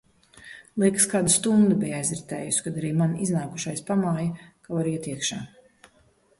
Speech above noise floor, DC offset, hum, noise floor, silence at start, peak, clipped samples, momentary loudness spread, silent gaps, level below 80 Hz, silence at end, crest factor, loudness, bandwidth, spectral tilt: 37 dB; under 0.1%; none; -62 dBFS; 0.35 s; -6 dBFS; under 0.1%; 15 LU; none; -60 dBFS; 0.95 s; 20 dB; -24 LUFS; 12 kHz; -4.5 dB/octave